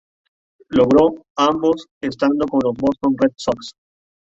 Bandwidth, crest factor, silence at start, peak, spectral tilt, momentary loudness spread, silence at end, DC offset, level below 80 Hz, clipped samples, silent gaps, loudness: 7.8 kHz; 16 dB; 0.7 s; -2 dBFS; -6 dB/octave; 10 LU; 0.65 s; under 0.1%; -50 dBFS; under 0.1%; 1.30-1.35 s, 1.91-2.01 s; -18 LUFS